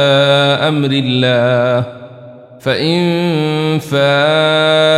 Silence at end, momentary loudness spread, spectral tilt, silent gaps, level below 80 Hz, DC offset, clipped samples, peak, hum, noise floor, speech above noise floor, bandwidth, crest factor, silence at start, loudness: 0 s; 7 LU; -6 dB/octave; none; -56 dBFS; under 0.1%; under 0.1%; -2 dBFS; none; -35 dBFS; 23 dB; 14 kHz; 12 dB; 0 s; -12 LUFS